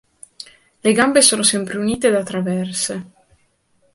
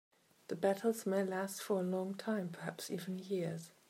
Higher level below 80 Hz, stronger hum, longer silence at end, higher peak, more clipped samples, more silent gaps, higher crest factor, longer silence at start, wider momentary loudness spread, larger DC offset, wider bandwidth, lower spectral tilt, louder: first, -56 dBFS vs -88 dBFS; neither; first, 0.9 s vs 0.2 s; first, 0 dBFS vs -20 dBFS; neither; neither; about the same, 20 dB vs 18 dB; first, 0.85 s vs 0.5 s; first, 25 LU vs 8 LU; neither; second, 12 kHz vs 16 kHz; second, -3 dB/octave vs -5.5 dB/octave; first, -16 LUFS vs -39 LUFS